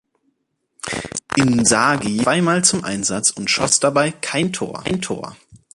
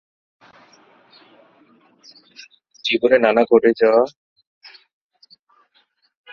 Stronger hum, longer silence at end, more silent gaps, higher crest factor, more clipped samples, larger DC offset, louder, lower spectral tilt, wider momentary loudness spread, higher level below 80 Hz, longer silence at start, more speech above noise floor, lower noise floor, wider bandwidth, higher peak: neither; second, 0.2 s vs 2.25 s; neither; about the same, 20 dB vs 22 dB; neither; neither; about the same, -18 LUFS vs -16 LUFS; second, -3 dB/octave vs -5 dB/octave; first, 12 LU vs 9 LU; first, -50 dBFS vs -66 dBFS; second, 0.85 s vs 2.85 s; first, 53 dB vs 48 dB; first, -71 dBFS vs -62 dBFS; first, 11.5 kHz vs 6.8 kHz; about the same, 0 dBFS vs 0 dBFS